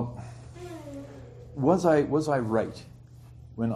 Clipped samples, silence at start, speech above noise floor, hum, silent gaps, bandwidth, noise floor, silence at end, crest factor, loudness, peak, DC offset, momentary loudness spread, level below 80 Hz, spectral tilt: under 0.1%; 0 s; 24 dB; none; none; 13 kHz; -48 dBFS; 0 s; 20 dB; -26 LUFS; -10 dBFS; under 0.1%; 22 LU; -54 dBFS; -7.5 dB/octave